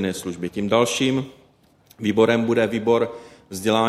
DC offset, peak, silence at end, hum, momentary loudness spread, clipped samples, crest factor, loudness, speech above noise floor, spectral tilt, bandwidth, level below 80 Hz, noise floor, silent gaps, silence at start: under 0.1%; -4 dBFS; 0 s; none; 11 LU; under 0.1%; 18 dB; -21 LUFS; 36 dB; -5 dB/octave; 15 kHz; -58 dBFS; -56 dBFS; none; 0 s